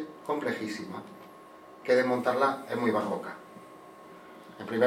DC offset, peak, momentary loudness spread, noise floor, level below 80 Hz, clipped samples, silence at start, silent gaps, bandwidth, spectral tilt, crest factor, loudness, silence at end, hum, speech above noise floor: under 0.1%; -12 dBFS; 23 LU; -50 dBFS; -80 dBFS; under 0.1%; 0 s; none; 16 kHz; -5.5 dB/octave; 20 dB; -30 LUFS; 0 s; none; 22 dB